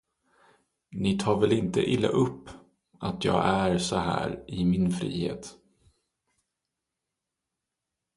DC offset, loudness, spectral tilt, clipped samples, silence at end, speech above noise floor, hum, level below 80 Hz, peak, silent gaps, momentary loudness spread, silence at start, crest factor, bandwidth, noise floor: under 0.1%; -27 LUFS; -6 dB/octave; under 0.1%; 2.65 s; 60 dB; none; -52 dBFS; -8 dBFS; none; 11 LU; 0.9 s; 22 dB; 11.5 kHz; -86 dBFS